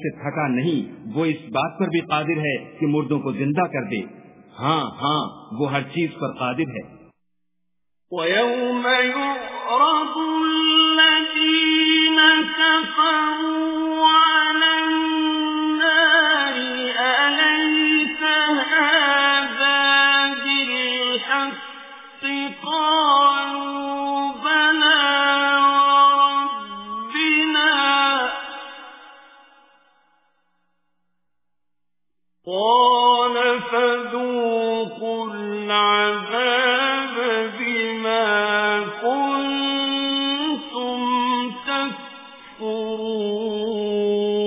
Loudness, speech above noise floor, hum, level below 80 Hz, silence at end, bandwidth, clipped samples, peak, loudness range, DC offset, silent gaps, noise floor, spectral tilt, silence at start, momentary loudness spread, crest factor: -19 LUFS; 63 dB; none; -66 dBFS; 0 s; 3.9 kHz; under 0.1%; 0 dBFS; 9 LU; under 0.1%; none; -84 dBFS; -7.5 dB/octave; 0 s; 12 LU; 20 dB